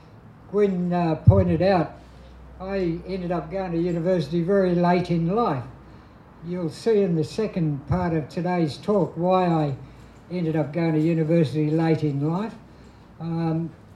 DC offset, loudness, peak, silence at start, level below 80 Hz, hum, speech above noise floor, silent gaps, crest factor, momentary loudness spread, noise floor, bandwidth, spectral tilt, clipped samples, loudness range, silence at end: under 0.1%; -23 LUFS; -2 dBFS; 0.15 s; -46 dBFS; none; 25 dB; none; 22 dB; 10 LU; -47 dBFS; 10 kHz; -8.5 dB/octave; under 0.1%; 2 LU; 0.2 s